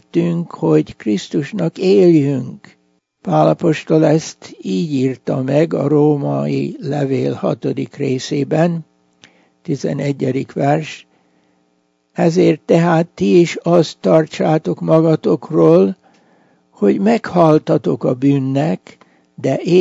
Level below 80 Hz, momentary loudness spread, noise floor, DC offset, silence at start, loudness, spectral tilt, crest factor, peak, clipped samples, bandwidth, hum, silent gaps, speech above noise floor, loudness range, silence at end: -60 dBFS; 9 LU; -62 dBFS; under 0.1%; 0.15 s; -15 LUFS; -7.5 dB/octave; 16 dB; 0 dBFS; under 0.1%; 8 kHz; none; none; 48 dB; 6 LU; 0 s